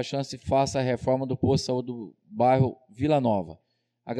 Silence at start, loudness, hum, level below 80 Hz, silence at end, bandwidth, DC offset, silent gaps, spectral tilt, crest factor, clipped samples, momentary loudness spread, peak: 0 s; -26 LUFS; none; -54 dBFS; 0 s; 11.5 kHz; under 0.1%; none; -6.5 dB/octave; 14 dB; under 0.1%; 12 LU; -12 dBFS